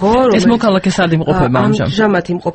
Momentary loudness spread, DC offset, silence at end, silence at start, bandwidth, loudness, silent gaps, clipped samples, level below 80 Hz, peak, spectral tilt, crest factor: 3 LU; under 0.1%; 0 s; 0 s; 8.6 kHz; -12 LUFS; none; under 0.1%; -34 dBFS; 0 dBFS; -6.5 dB/octave; 12 dB